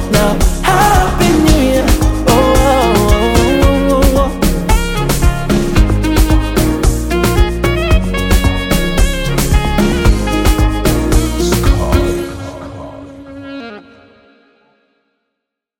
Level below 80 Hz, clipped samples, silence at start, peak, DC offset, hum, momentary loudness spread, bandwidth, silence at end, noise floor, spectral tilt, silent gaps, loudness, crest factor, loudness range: -16 dBFS; under 0.1%; 0 s; 0 dBFS; under 0.1%; none; 14 LU; 17 kHz; 2 s; -76 dBFS; -5.5 dB/octave; none; -12 LUFS; 12 dB; 8 LU